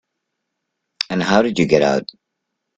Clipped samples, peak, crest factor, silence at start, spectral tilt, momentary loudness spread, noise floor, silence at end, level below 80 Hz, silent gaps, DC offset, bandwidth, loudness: under 0.1%; 0 dBFS; 20 dB; 1 s; -5.5 dB/octave; 11 LU; -77 dBFS; 0.75 s; -54 dBFS; none; under 0.1%; 9.2 kHz; -17 LUFS